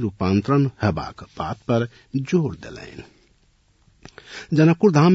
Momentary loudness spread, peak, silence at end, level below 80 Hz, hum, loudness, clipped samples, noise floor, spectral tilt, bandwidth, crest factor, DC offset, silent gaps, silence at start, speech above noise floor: 22 LU; -4 dBFS; 0 s; -52 dBFS; none; -21 LUFS; under 0.1%; -60 dBFS; -7.5 dB/octave; 7.8 kHz; 16 dB; under 0.1%; none; 0 s; 40 dB